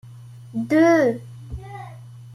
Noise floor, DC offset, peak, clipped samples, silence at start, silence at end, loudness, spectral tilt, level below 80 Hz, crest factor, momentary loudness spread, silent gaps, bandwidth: -41 dBFS; under 0.1%; -6 dBFS; under 0.1%; 0.05 s; 0 s; -18 LUFS; -7 dB/octave; -48 dBFS; 16 dB; 22 LU; none; 12.5 kHz